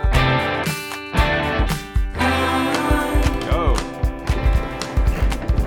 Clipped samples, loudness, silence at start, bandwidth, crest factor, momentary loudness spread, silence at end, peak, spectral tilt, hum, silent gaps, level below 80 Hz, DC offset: under 0.1%; -20 LUFS; 0 s; 17 kHz; 16 dB; 6 LU; 0 s; -2 dBFS; -5.5 dB/octave; none; none; -22 dBFS; under 0.1%